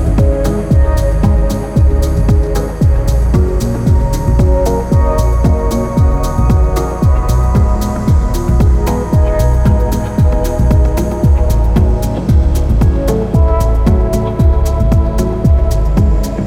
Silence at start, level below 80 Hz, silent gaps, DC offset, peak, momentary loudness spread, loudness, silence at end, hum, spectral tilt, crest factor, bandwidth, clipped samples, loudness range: 0 s; -12 dBFS; none; under 0.1%; 0 dBFS; 3 LU; -13 LUFS; 0 s; none; -8 dB/octave; 10 dB; 15.5 kHz; under 0.1%; 1 LU